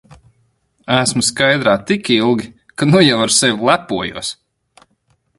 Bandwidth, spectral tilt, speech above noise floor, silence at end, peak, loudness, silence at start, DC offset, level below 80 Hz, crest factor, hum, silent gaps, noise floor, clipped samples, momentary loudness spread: 11.5 kHz; -3.5 dB/octave; 47 dB; 1.05 s; 0 dBFS; -14 LUFS; 0.1 s; under 0.1%; -52 dBFS; 16 dB; none; none; -62 dBFS; under 0.1%; 12 LU